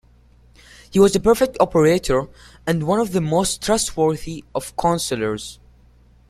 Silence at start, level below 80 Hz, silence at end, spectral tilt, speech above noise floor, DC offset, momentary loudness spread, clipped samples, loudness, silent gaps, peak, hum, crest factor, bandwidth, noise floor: 0.9 s; -42 dBFS; 0.75 s; -5 dB/octave; 32 dB; under 0.1%; 13 LU; under 0.1%; -19 LUFS; none; -2 dBFS; none; 18 dB; 15.5 kHz; -51 dBFS